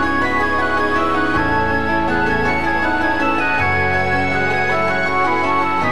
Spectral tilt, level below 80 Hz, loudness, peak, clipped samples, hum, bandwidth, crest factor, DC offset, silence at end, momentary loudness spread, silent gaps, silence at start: -6 dB/octave; -36 dBFS; -17 LUFS; -4 dBFS; under 0.1%; none; 13 kHz; 12 dB; 5%; 0 s; 1 LU; none; 0 s